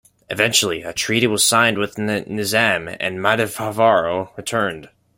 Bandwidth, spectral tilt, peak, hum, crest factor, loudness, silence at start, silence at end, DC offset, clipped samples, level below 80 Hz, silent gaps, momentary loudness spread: 16.5 kHz; -3 dB/octave; -2 dBFS; none; 18 dB; -18 LUFS; 0.3 s; 0.3 s; under 0.1%; under 0.1%; -56 dBFS; none; 9 LU